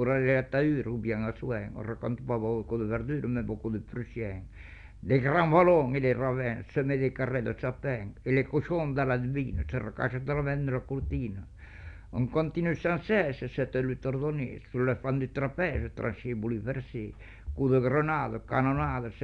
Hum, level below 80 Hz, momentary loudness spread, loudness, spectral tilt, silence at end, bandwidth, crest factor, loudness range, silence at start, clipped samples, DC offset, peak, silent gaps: none; -46 dBFS; 12 LU; -30 LUFS; -9.5 dB/octave; 0 s; 6.2 kHz; 20 dB; 6 LU; 0 s; under 0.1%; under 0.1%; -10 dBFS; none